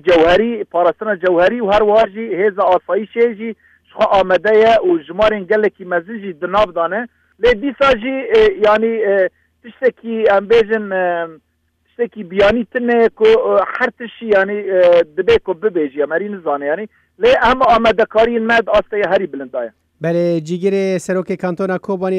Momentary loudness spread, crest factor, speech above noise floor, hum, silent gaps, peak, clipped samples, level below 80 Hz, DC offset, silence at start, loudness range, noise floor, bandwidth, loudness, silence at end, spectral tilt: 10 LU; 12 dB; 48 dB; none; none; -2 dBFS; under 0.1%; -42 dBFS; under 0.1%; 0.05 s; 3 LU; -62 dBFS; 9.6 kHz; -15 LUFS; 0 s; -6 dB/octave